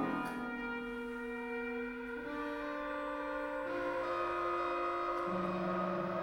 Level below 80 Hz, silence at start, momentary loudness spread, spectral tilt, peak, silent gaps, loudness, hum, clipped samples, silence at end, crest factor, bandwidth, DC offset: -62 dBFS; 0 s; 6 LU; -6.5 dB/octave; -24 dBFS; none; -38 LUFS; none; under 0.1%; 0 s; 14 dB; 17 kHz; under 0.1%